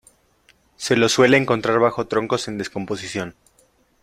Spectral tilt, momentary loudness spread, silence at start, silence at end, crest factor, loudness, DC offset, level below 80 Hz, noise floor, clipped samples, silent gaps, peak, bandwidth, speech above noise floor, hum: -4.5 dB/octave; 14 LU; 0.8 s; 0.7 s; 20 dB; -20 LUFS; under 0.1%; -56 dBFS; -60 dBFS; under 0.1%; none; -2 dBFS; 15.5 kHz; 40 dB; none